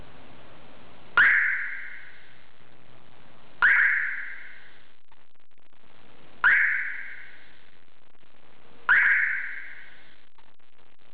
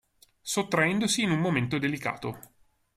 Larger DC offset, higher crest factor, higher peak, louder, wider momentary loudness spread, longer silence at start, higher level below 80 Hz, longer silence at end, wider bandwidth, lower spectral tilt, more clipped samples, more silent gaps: first, 2% vs under 0.1%; about the same, 18 dB vs 18 dB; about the same, -10 dBFS vs -10 dBFS; first, -22 LUFS vs -27 LUFS; first, 24 LU vs 13 LU; first, 1.15 s vs 0.45 s; second, -68 dBFS vs -62 dBFS; first, 1.3 s vs 0.55 s; second, 4.9 kHz vs 15 kHz; about the same, -5.5 dB/octave vs -4.5 dB/octave; neither; neither